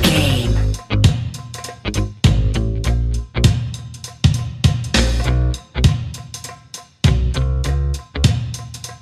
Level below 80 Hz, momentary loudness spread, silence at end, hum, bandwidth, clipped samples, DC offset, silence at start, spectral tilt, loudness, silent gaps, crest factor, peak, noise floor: -22 dBFS; 14 LU; 0.05 s; none; 15 kHz; under 0.1%; under 0.1%; 0 s; -5 dB/octave; -19 LUFS; none; 18 dB; 0 dBFS; -38 dBFS